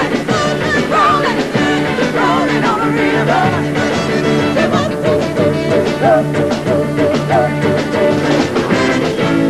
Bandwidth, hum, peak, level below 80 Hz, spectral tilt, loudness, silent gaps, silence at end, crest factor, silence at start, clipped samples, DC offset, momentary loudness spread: 13 kHz; none; 0 dBFS; -42 dBFS; -6 dB/octave; -14 LUFS; none; 0 s; 14 dB; 0 s; under 0.1%; under 0.1%; 3 LU